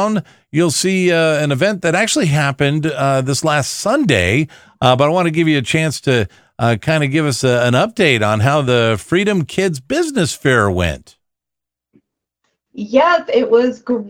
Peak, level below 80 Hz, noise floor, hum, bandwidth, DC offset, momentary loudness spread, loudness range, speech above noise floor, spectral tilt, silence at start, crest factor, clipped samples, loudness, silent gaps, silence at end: 0 dBFS; -44 dBFS; -84 dBFS; none; 16.5 kHz; under 0.1%; 5 LU; 4 LU; 69 dB; -5 dB/octave; 0 s; 16 dB; under 0.1%; -15 LUFS; none; 0 s